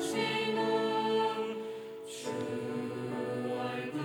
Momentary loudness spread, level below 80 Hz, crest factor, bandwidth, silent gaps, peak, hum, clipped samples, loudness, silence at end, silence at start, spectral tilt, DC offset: 10 LU; -82 dBFS; 14 dB; 19 kHz; none; -20 dBFS; none; under 0.1%; -34 LUFS; 0 s; 0 s; -4.5 dB/octave; under 0.1%